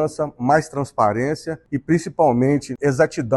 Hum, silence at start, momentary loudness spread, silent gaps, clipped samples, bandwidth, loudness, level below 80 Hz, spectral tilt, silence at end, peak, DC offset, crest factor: none; 0 s; 9 LU; none; under 0.1%; 12 kHz; -20 LUFS; -52 dBFS; -7 dB/octave; 0 s; -4 dBFS; under 0.1%; 16 dB